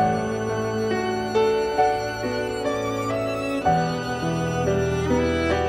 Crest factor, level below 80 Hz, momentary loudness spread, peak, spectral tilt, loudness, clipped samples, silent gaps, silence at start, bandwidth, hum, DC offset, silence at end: 14 dB; -42 dBFS; 4 LU; -8 dBFS; -6 dB/octave; -24 LUFS; under 0.1%; none; 0 s; 16 kHz; none; under 0.1%; 0 s